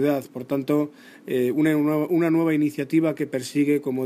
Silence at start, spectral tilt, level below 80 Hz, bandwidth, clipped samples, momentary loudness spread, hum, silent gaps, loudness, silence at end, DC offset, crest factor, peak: 0 s; -7 dB/octave; -70 dBFS; 15.5 kHz; under 0.1%; 8 LU; none; none; -23 LUFS; 0 s; under 0.1%; 14 dB; -10 dBFS